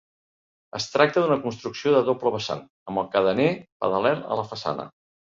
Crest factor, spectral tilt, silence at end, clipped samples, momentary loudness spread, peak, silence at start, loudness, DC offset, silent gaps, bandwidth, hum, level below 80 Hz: 22 dB; -5.5 dB/octave; 0.5 s; under 0.1%; 11 LU; -2 dBFS; 0.75 s; -24 LUFS; under 0.1%; 2.70-2.86 s, 3.72-3.80 s; 7.6 kHz; none; -62 dBFS